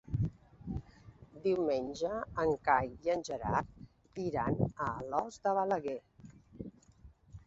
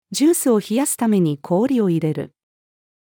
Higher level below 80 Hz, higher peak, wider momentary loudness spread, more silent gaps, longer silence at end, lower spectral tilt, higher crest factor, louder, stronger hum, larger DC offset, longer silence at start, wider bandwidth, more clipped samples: first, -54 dBFS vs -72 dBFS; second, -14 dBFS vs -6 dBFS; first, 18 LU vs 7 LU; neither; second, 0.1 s vs 0.9 s; about the same, -6 dB/octave vs -5.5 dB/octave; first, 22 dB vs 14 dB; second, -35 LUFS vs -18 LUFS; neither; neither; about the same, 0.05 s vs 0.1 s; second, 8 kHz vs 19.5 kHz; neither